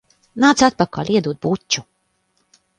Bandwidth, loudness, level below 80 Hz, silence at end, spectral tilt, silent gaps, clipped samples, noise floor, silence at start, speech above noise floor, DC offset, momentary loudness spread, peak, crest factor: 10.5 kHz; -18 LUFS; -52 dBFS; 0.95 s; -4 dB/octave; none; under 0.1%; -66 dBFS; 0.35 s; 49 dB; under 0.1%; 9 LU; 0 dBFS; 20 dB